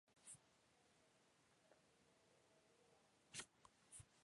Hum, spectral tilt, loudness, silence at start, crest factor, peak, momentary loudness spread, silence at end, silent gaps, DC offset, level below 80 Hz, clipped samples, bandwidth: none; -1.5 dB/octave; -60 LUFS; 0.05 s; 30 dB; -38 dBFS; 7 LU; 0 s; none; under 0.1%; -88 dBFS; under 0.1%; 11.5 kHz